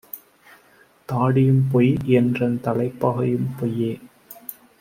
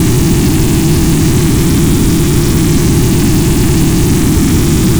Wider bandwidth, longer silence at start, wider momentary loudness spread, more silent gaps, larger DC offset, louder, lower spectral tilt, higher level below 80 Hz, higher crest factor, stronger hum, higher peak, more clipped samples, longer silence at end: second, 16.5 kHz vs over 20 kHz; first, 0.15 s vs 0 s; first, 19 LU vs 0 LU; neither; neither; second, -21 LUFS vs -10 LUFS; first, -9 dB/octave vs -5.5 dB/octave; second, -56 dBFS vs -16 dBFS; first, 18 dB vs 8 dB; neither; second, -4 dBFS vs 0 dBFS; neither; first, 0.3 s vs 0 s